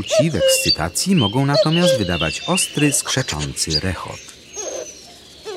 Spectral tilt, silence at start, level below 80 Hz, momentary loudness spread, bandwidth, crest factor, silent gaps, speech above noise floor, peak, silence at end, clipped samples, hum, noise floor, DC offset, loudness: -3.5 dB/octave; 0 s; -42 dBFS; 17 LU; 16 kHz; 16 dB; none; 23 dB; -2 dBFS; 0 s; under 0.1%; none; -41 dBFS; under 0.1%; -17 LUFS